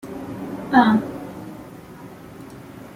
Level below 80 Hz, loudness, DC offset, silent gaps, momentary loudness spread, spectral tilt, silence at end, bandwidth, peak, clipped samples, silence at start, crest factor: -56 dBFS; -20 LUFS; under 0.1%; none; 24 LU; -6.5 dB/octave; 0 s; 16 kHz; -2 dBFS; under 0.1%; 0.05 s; 22 dB